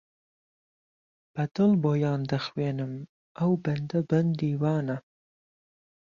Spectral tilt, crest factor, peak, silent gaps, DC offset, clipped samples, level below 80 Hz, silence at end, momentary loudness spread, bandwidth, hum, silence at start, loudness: -8.5 dB/octave; 16 dB; -12 dBFS; 3.09-3.35 s; under 0.1%; under 0.1%; -66 dBFS; 1.05 s; 13 LU; 7.2 kHz; none; 1.35 s; -28 LUFS